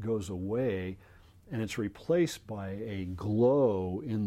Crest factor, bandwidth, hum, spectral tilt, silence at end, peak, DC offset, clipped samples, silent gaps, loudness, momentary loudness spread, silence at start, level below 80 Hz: 16 dB; 16 kHz; none; -7 dB/octave; 0 s; -14 dBFS; under 0.1%; under 0.1%; none; -32 LUFS; 13 LU; 0 s; -60 dBFS